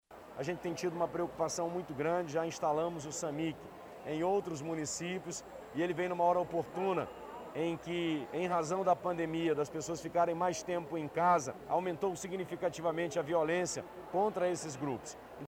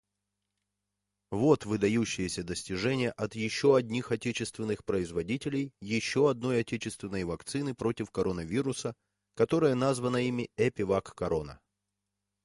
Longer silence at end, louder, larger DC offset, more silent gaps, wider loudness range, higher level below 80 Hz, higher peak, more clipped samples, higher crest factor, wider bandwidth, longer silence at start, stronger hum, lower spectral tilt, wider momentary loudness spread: second, 0 s vs 0.9 s; second, -35 LUFS vs -31 LUFS; neither; neither; about the same, 3 LU vs 2 LU; second, -68 dBFS vs -56 dBFS; second, -18 dBFS vs -12 dBFS; neither; about the same, 18 dB vs 20 dB; first, 17 kHz vs 11.5 kHz; second, 0.1 s vs 1.3 s; second, none vs 50 Hz at -65 dBFS; about the same, -5 dB/octave vs -5.5 dB/octave; about the same, 9 LU vs 9 LU